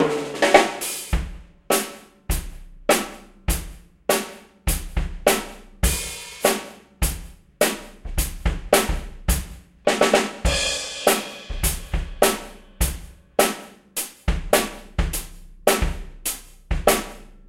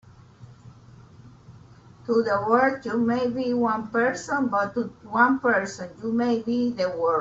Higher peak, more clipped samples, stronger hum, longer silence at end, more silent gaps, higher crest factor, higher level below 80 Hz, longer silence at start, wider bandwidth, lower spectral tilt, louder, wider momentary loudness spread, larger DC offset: first, 0 dBFS vs -6 dBFS; neither; neither; about the same, 0.1 s vs 0 s; neither; first, 24 dB vs 18 dB; first, -30 dBFS vs -62 dBFS; second, 0 s vs 0.4 s; first, 16 kHz vs 7.8 kHz; second, -3 dB/octave vs -5.5 dB/octave; about the same, -23 LUFS vs -24 LUFS; first, 14 LU vs 8 LU; neither